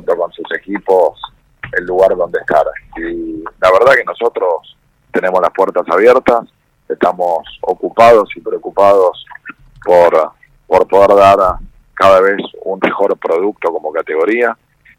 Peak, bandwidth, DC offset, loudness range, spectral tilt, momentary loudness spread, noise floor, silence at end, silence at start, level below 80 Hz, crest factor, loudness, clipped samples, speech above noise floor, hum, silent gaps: 0 dBFS; 15.5 kHz; under 0.1%; 3 LU; -5.5 dB/octave; 15 LU; -34 dBFS; 0.45 s; 0.05 s; -42 dBFS; 12 dB; -12 LUFS; 1%; 23 dB; none; none